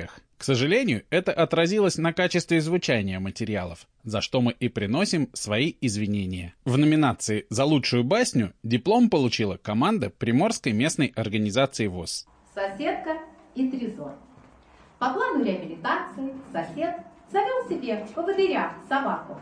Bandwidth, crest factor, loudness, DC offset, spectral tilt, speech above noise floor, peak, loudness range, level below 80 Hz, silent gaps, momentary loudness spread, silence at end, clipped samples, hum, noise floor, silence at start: 10.5 kHz; 14 dB; -25 LUFS; under 0.1%; -5 dB/octave; 29 dB; -10 dBFS; 7 LU; -58 dBFS; none; 11 LU; 0 s; under 0.1%; none; -54 dBFS; 0 s